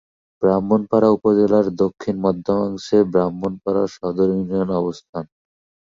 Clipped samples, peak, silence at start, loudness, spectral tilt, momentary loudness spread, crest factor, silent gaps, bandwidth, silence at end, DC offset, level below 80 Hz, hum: under 0.1%; -4 dBFS; 0.4 s; -19 LUFS; -8 dB/octave; 10 LU; 16 dB; 5.09-5.13 s; 7.6 kHz; 0.6 s; under 0.1%; -52 dBFS; none